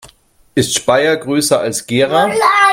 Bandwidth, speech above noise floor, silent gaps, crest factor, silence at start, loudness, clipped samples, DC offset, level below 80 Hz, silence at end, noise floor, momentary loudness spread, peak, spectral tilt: 16.5 kHz; 36 dB; none; 14 dB; 0.05 s; -13 LUFS; under 0.1%; under 0.1%; -52 dBFS; 0 s; -48 dBFS; 5 LU; 0 dBFS; -3.5 dB/octave